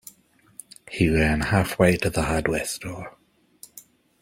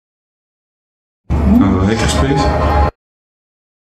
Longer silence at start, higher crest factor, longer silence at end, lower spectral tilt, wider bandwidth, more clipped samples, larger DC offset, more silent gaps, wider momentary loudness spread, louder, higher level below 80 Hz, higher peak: second, 0.9 s vs 1.3 s; first, 20 dB vs 14 dB; second, 0.4 s vs 0.95 s; about the same, -5.5 dB/octave vs -6.5 dB/octave; first, 16.5 kHz vs 12.5 kHz; neither; neither; neither; first, 24 LU vs 6 LU; second, -22 LUFS vs -14 LUFS; second, -40 dBFS vs -22 dBFS; second, -4 dBFS vs 0 dBFS